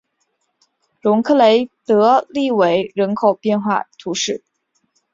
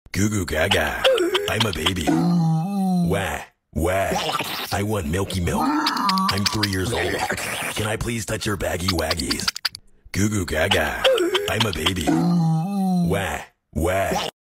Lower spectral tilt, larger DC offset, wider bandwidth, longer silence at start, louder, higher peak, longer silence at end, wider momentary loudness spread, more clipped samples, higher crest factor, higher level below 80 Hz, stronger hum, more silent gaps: about the same, -4.5 dB/octave vs -4.5 dB/octave; neither; second, 7.8 kHz vs 16 kHz; first, 1.05 s vs 0.15 s; first, -16 LUFS vs -22 LUFS; about the same, -2 dBFS vs -2 dBFS; first, 0.75 s vs 0.15 s; first, 9 LU vs 6 LU; neither; about the same, 16 dB vs 20 dB; second, -64 dBFS vs -40 dBFS; neither; neither